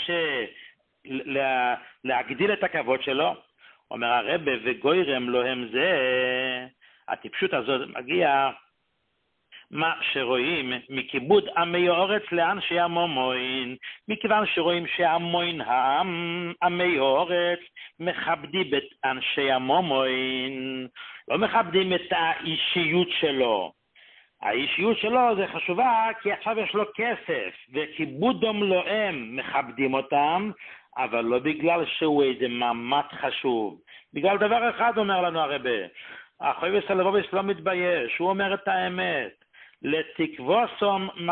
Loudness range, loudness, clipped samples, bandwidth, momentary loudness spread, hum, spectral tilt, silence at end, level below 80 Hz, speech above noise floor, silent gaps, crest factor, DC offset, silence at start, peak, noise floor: 2 LU; -25 LUFS; under 0.1%; 4.4 kHz; 9 LU; none; -9 dB/octave; 0 s; -66 dBFS; 49 dB; none; 18 dB; under 0.1%; 0 s; -8 dBFS; -74 dBFS